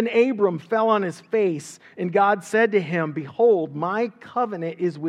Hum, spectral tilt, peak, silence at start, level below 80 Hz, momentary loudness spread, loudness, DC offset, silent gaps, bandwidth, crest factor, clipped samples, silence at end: none; -6.5 dB/octave; -6 dBFS; 0 s; -80 dBFS; 8 LU; -22 LUFS; under 0.1%; none; 11.5 kHz; 16 dB; under 0.1%; 0 s